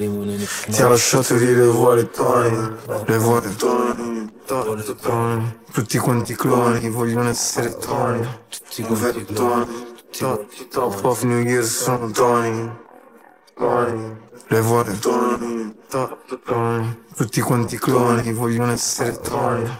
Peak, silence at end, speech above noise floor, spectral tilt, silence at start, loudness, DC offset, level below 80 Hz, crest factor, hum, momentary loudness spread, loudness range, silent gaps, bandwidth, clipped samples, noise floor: -2 dBFS; 0 s; 29 dB; -5 dB/octave; 0 s; -20 LUFS; under 0.1%; -54 dBFS; 18 dB; none; 12 LU; 5 LU; none; 16.5 kHz; under 0.1%; -49 dBFS